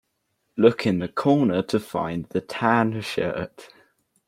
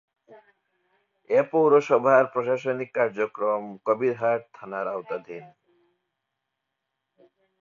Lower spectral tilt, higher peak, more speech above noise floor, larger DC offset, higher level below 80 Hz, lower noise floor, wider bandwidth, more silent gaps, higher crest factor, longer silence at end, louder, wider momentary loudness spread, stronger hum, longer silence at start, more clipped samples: about the same, -7 dB/octave vs -7 dB/octave; about the same, -4 dBFS vs -6 dBFS; second, 51 dB vs 58 dB; neither; first, -60 dBFS vs -76 dBFS; second, -74 dBFS vs -82 dBFS; first, 16 kHz vs 7.2 kHz; neither; about the same, 20 dB vs 20 dB; second, 0.6 s vs 2.15 s; about the same, -23 LUFS vs -24 LUFS; second, 10 LU vs 15 LU; neither; first, 0.55 s vs 0.3 s; neither